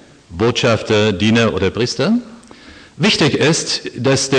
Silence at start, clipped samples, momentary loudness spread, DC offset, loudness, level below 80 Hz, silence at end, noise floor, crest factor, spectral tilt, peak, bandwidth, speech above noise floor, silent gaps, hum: 0.3 s; under 0.1%; 6 LU; under 0.1%; -15 LUFS; -46 dBFS; 0 s; -40 dBFS; 14 dB; -4.5 dB/octave; -2 dBFS; 10 kHz; 25 dB; none; none